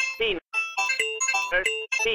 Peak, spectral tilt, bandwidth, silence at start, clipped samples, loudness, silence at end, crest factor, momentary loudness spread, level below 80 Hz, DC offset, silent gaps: -10 dBFS; 0.5 dB/octave; 16.5 kHz; 0 s; under 0.1%; -24 LUFS; 0 s; 16 dB; 4 LU; -52 dBFS; under 0.1%; 0.41-0.45 s